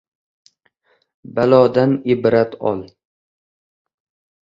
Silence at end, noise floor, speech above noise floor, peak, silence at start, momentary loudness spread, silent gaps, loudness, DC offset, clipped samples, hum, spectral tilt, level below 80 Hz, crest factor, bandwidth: 1.55 s; -62 dBFS; 47 dB; 0 dBFS; 1.3 s; 12 LU; none; -16 LUFS; under 0.1%; under 0.1%; none; -9 dB/octave; -58 dBFS; 20 dB; 7.4 kHz